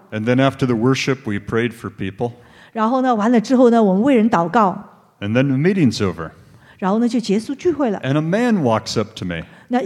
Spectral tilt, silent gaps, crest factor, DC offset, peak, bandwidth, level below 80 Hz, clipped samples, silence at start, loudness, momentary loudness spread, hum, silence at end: -6.5 dB/octave; none; 16 dB; under 0.1%; -2 dBFS; 12 kHz; -54 dBFS; under 0.1%; 0.1 s; -18 LUFS; 12 LU; none; 0 s